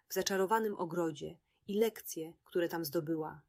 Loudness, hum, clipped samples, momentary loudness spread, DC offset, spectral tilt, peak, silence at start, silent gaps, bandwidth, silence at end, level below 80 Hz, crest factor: -36 LUFS; none; under 0.1%; 12 LU; under 0.1%; -4.5 dB/octave; -16 dBFS; 0.1 s; none; 16 kHz; 0.1 s; -76 dBFS; 20 dB